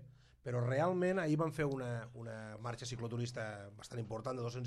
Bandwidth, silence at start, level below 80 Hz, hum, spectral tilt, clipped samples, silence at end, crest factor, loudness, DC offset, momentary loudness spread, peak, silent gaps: 12 kHz; 0 s; -68 dBFS; none; -6.5 dB/octave; under 0.1%; 0 s; 16 dB; -39 LUFS; under 0.1%; 13 LU; -24 dBFS; none